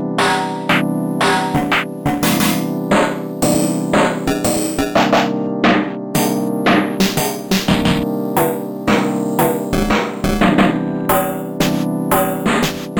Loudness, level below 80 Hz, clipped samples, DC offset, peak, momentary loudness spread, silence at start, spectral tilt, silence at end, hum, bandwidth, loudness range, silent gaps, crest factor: -16 LUFS; -36 dBFS; under 0.1%; under 0.1%; -2 dBFS; 4 LU; 0 s; -4.5 dB/octave; 0 s; none; over 20 kHz; 1 LU; none; 14 dB